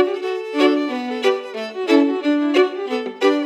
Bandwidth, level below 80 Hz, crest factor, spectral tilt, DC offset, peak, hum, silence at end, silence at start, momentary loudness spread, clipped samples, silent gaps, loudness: 11 kHz; under -90 dBFS; 16 dB; -3.5 dB/octave; under 0.1%; -2 dBFS; none; 0 s; 0 s; 8 LU; under 0.1%; none; -19 LUFS